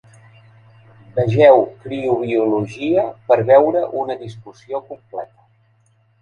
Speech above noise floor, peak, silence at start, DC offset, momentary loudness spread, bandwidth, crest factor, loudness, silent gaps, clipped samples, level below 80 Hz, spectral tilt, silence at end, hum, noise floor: 41 dB; 0 dBFS; 1.15 s; under 0.1%; 20 LU; 6.8 kHz; 18 dB; -16 LUFS; none; under 0.1%; -56 dBFS; -8 dB/octave; 0.95 s; none; -58 dBFS